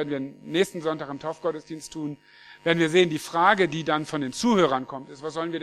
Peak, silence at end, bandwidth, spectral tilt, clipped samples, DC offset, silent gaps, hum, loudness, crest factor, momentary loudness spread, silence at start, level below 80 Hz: -4 dBFS; 0 s; 14 kHz; -5 dB/octave; under 0.1%; under 0.1%; none; none; -25 LUFS; 22 dB; 15 LU; 0 s; -64 dBFS